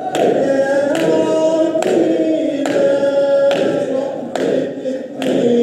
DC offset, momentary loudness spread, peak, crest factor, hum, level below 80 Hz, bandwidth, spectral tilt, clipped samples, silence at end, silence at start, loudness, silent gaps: under 0.1%; 7 LU; 0 dBFS; 14 dB; none; -68 dBFS; 13 kHz; -5.5 dB/octave; under 0.1%; 0 s; 0 s; -16 LUFS; none